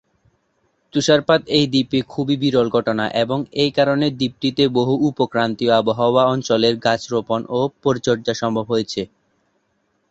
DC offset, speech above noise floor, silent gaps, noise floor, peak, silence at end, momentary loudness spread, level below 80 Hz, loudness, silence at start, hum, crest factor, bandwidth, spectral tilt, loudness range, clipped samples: under 0.1%; 49 dB; none; -67 dBFS; -2 dBFS; 1.05 s; 6 LU; -56 dBFS; -19 LUFS; 0.95 s; none; 16 dB; 8.2 kHz; -5.5 dB/octave; 3 LU; under 0.1%